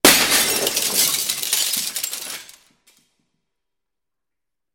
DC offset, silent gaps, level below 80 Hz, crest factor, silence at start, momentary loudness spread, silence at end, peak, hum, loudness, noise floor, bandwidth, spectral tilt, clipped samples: under 0.1%; none; -54 dBFS; 22 dB; 0.05 s; 14 LU; 2.3 s; 0 dBFS; none; -17 LUFS; -86 dBFS; 17 kHz; 0 dB/octave; under 0.1%